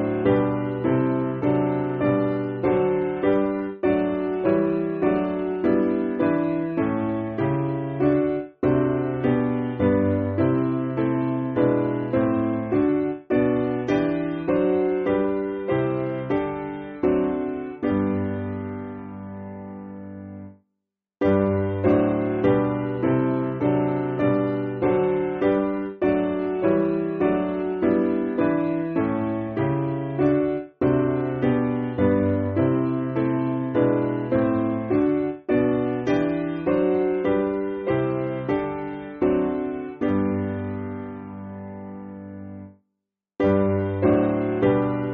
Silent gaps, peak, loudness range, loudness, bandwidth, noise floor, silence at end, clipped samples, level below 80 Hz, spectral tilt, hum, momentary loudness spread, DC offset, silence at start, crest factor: none; -8 dBFS; 4 LU; -23 LUFS; 4.7 kHz; -82 dBFS; 0 s; under 0.1%; -52 dBFS; -8 dB/octave; none; 9 LU; under 0.1%; 0 s; 16 dB